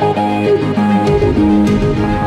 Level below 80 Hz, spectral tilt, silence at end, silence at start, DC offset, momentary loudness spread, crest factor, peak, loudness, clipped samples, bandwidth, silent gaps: -28 dBFS; -8 dB/octave; 0 s; 0 s; under 0.1%; 3 LU; 8 dB; -4 dBFS; -13 LUFS; under 0.1%; 11 kHz; none